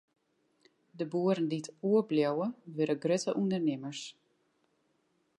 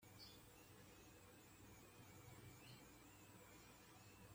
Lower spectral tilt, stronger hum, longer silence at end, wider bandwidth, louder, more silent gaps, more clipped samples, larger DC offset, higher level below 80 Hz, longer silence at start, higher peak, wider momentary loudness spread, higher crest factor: first, -6 dB/octave vs -4 dB/octave; neither; first, 1.3 s vs 0 s; second, 11.5 kHz vs 16.5 kHz; first, -32 LUFS vs -64 LUFS; neither; neither; neither; second, -84 dBFS vs -78 dBFS; first, 0.95 s vs 0 s; first, -16 dBFS vs -50 dBFS; first, 11 LU vs 3 LU; about the same, 16 dB vs 14 dB